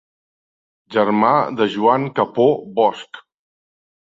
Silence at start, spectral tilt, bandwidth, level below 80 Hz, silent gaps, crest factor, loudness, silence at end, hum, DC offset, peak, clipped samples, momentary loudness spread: 0.9 s; -7 dB/octave; 7.6 kHz; -64 dBFS; none; 18 dB; -17 LUFS; 0.95 s; none; under 0.1%; -2 dBFS; under 0.1%; 7 LU